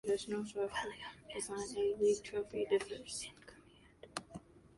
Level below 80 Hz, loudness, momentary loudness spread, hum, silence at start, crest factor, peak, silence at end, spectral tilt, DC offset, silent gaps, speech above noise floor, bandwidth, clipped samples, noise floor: -68 dBFS; -39 LUFS; 16 LU; none; 0.05 s; 18 dB; -20 dBFS; 0.1 s; -3.5 dB/octave; under 0.1%; none; 25 dB; 11.5 kHz; under 0.1%; -63 dBFS